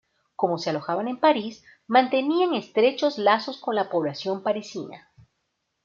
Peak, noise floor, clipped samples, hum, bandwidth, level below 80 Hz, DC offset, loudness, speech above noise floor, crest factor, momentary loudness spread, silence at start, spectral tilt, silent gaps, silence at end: -4 dBFS; -77 dBFS; under 0.1%; none; 7.4 kHz; -74 dBFS; under 0.1%; -24 LUFS; 53 dB; 20 dB; 11 LU; 0.4 s; -5.5 dB/octave; none; 0.85 s